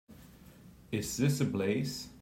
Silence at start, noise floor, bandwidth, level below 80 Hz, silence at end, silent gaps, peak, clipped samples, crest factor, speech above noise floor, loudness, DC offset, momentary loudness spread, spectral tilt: 0.1 s; -55 dBFS; 16 kHz; -60 dBFS; 0 s; none; -18 dBFS; under 0.1%; 16 dB; 23 dB; -33 LUFS; under 0.1%; 8 LU; -5.5 dB/octave